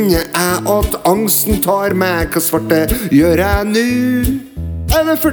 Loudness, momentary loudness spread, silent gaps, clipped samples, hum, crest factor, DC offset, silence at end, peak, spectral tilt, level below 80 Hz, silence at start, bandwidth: -14 LUFS; 4 LU; none; under 0.1%; none; 14 dB; under 0.1%; 0 s; 0 dBFS; -4.5 dB/octave; -26 dBFS; 0 s; over 20 kHz